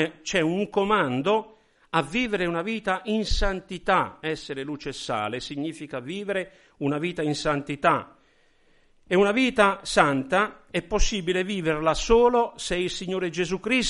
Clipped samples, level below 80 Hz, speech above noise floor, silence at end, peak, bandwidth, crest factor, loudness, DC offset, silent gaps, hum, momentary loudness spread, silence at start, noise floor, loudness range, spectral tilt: under 0.1%; -38 dBFS; 36 dB; 0 s; -2 dBFS; 11.5 kHz; 22 dB; -25 LUFS; under 0.1%; none; none; 11 LU; 0 s; -61 dBFS; 6 LU; -4.5 dB/octave